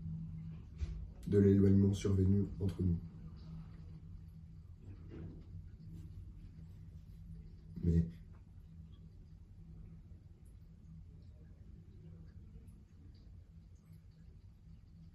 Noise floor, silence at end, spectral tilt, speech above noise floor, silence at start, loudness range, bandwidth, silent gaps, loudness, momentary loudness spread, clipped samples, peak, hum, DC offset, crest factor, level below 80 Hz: -58 dBFS; 0.05 s; -9 dB/octave; 27 dB; 0 s; 23 LU; 8.6 kHz; none; -35 LUFS; 27 LU; under 0.1%; -18 dBFS; none; under 0.1%; 22 dB; -54 dBFS